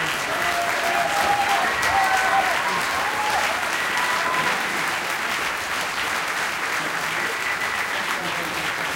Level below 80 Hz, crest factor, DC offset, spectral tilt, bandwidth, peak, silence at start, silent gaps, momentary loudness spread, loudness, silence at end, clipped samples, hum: -54 dBFS; 16 dB; under 0.1%; -1.5 dB/octave; 17 kHz; -6 dBFS; 0 s; none; 4 LU; -22 LUFS; 0 s; under 0.1%; none